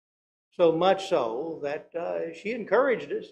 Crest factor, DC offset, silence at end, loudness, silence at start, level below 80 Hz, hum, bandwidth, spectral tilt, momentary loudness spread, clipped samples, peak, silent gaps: 18 dB; under 0.1%; 0.05 s; -27 LUFS; 0.6 s; -72 dBFS; 60 Hz at -55 dBFS; 10 kHz; -5.5 dB/octave; 11 LU; under 0.1%; -8 dBFS; none